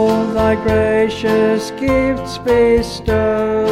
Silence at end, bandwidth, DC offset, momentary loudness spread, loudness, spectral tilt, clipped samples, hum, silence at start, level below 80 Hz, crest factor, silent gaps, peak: 0 s; 15 kHz; under 0.1%; 4 LU; -15 LUFS; -6 dB/octave; under 0.1%; none; 0 s; -32 dBFS; 12 dB; none; -2 dBFS